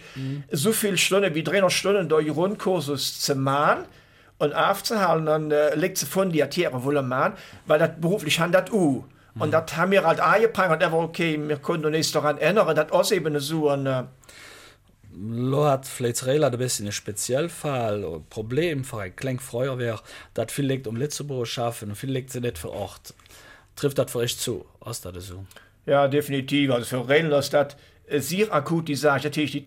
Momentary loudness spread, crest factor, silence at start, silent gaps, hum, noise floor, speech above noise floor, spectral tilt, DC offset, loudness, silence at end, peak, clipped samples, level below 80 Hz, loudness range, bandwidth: 13 LU; 18 dB; 0 s; none; none; -51 dBFS; 28 dB; -4.5 dB/octave; under 0.1%; -24 LUFS; 0 s; -6 dBFS; under 0.1%; -58 dBFS; 8 LU; 16.5 kHz